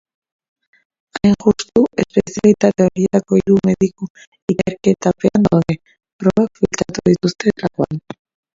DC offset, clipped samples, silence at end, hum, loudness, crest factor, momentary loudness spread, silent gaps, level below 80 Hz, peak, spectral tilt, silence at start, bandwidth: under 0.1%; under 0.1%; 0.55 s; none; -16 LUFS; 16 dB; 12 LU; 4.10-4.15 s, 4.27-4.32 s, 4.42-4.48 s, 6.13-6.19 s; -46 dBFS; 0 dBFS; -6.5 dB/octave; 1.15 s; 7.8 kHz